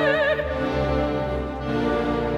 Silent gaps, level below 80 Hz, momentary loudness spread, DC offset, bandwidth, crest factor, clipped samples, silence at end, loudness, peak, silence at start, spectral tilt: none; -34 dBFS; 6 LU; under 0.1%; 11.5 kHz; 14 dB; under 0.1%; 0 s; -24 LUFS; -8 dBFS; 0 s; -7 dB/octave